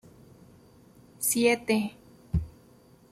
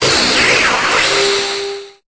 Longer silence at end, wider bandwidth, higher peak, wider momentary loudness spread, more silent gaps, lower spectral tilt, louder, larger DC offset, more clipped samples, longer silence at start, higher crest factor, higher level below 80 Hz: first, 0.6 s vs 0.2 s; first, 15.5 kHz vs 8 kHz; second, -10 dBFS vs 0 dBFS; about the same, 12 LU vs 12 LU; neither; first, -4 dB/octave vs -1.5 dB/octave; second, -27 LUFS vs -11 LUFS; neither; neither; first, 1.2 s vs 0 s; first, 20 dB vs 14 dB; second, -46 dBFS vs -40 dBFS